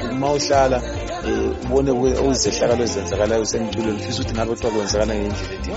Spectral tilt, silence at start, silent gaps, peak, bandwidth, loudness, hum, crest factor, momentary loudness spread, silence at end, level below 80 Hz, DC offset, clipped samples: -4.5 dB/octave; 0 s; none; -4 dBFS; 8 kHz; -20 LUFS; none; 16 dB; 6 LU; 0 s; -32 dBFS; under 0.1%; under 0.1%